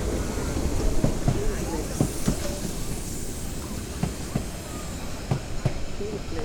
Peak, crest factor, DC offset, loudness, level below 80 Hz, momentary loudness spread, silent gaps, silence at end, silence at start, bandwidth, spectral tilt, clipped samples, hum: -8 dBFS; 18 dB; under 0.1%; -30 LUFS; -32 dBFS; 8 LU; none; 0 s; 0 s; 19 kHz; -5.5 dB/octave; under 0.1%; none